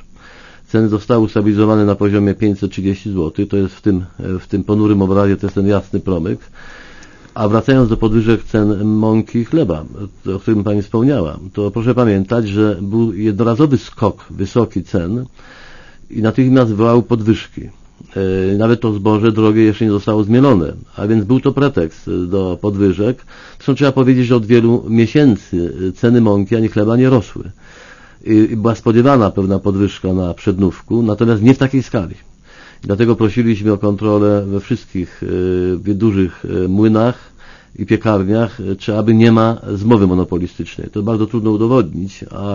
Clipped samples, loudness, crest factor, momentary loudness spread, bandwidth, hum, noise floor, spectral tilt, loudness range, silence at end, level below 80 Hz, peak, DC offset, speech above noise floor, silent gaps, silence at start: under 0.1%; -14 LUFS; 14 dB; 10 LU; 7.4 kHz; none; -41 dBFS; -8.5 dB/octave; 3 LU; 0 s; -38 dBFS; 0 dBFS; under 0.1%; 27 dB; none; 0.75 s